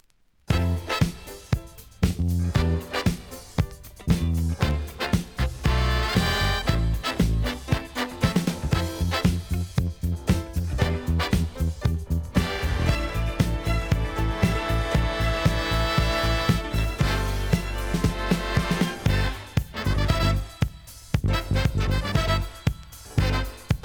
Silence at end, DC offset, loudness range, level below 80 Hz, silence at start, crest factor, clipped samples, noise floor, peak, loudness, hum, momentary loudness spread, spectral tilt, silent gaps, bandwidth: 0.05 s; under 0.1%; 2 LU; -30 dBFS; 0.5 s; 18 dB; under 0.1%; -57 dBFS; -6 dBFS; -26 LUFS; none; 6 LU; -5.5 dB/octave; none; over 20 kHz